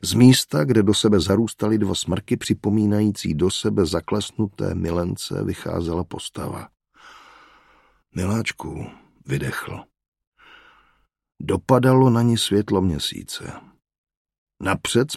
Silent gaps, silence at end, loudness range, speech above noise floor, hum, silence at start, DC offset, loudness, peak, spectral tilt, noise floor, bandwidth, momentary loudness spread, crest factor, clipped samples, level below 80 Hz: 10.08-10.12 s, 10.27-10.32 s, 13.98-14.04 s, 14.17-14.25 s, 14.38-14.47 s; 0 s; 10 LU; 43 dB; none; 0 s; under 0.1%; -21 LUFS; 0 dBFS; -5.5 dB/octave; -64 dBFS; 15 kHz; 16 LU; 20 dB; under 0.1%; -46 dBFS